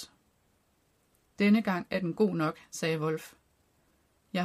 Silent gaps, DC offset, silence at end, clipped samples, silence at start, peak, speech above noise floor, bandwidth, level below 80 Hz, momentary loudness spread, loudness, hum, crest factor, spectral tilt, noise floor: none; under 0.1%; 0 s; under 0.1%; 0 s; -14 dBFS; 42 dB; 15 kHz; -70 dBFS; 12 LU; -30 LUFS; none; 18 dB; -6 dB/octave; -71 dBFS